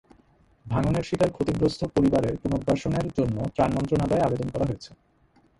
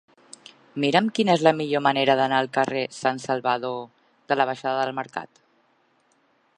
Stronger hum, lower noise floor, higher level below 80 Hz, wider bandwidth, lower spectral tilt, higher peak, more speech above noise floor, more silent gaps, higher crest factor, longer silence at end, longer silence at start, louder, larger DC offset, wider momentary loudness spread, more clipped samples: neither; about the same, -62 dBFS vs -65 dBFS; first, -44 dBFS vs -74 dBFS; about the same, 11.5 kHz vs 10.5 kHz; first, -7.5 dB/octave vs -5 dB/octave; second, -8 dBFS vs -2 dBFS; second, 37 dB vs 42 dB; neither; about the same, 18 dB vs 22 dB; second, 0.65 s vs 1.3 s; about the same, 0.65 s vs 0.75 s; about the same, -25 LUFS vs -23 LUFS; neither; second, 6 LU vs 13 LU; neither